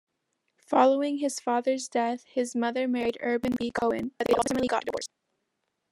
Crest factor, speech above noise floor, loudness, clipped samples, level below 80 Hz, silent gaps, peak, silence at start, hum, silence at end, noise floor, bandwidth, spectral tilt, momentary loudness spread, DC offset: 20 dB; 53 dB; -27 LUFS; under 0.1%; -62 dBFS; none; -8 dBFS; 0.7 s; none; 0.85 s; -80 dBFS; 15 kHz; -4 dB/octave; 7 LU; under 0.1%